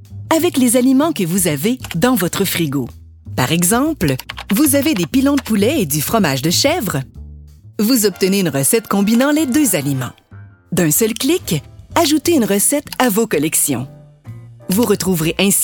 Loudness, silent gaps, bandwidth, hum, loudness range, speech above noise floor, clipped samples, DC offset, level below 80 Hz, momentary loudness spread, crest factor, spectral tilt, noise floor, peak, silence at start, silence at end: -15 LUFS; none; 17.5 kHz; none; 1 LU; 25 dB; under 0.1%; under 0.1%; -42 dBFS; 9 LU; 16 dB; -4 dB/octave; -39 dBFS; 0 dBFS; 0 s; 0 s